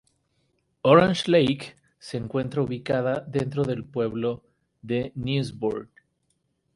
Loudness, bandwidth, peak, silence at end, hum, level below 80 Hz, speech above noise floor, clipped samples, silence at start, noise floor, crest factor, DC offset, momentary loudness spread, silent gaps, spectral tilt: -25 LUFS; 11.5 kHz; -2 dBFS; 0.9 s; none; -56 dBFS; 49 dB; under 0.1%; 0.85 s; -73 dBFS; 22 dB; under 0.1%; 16 LU; none; -6.5 dB/octave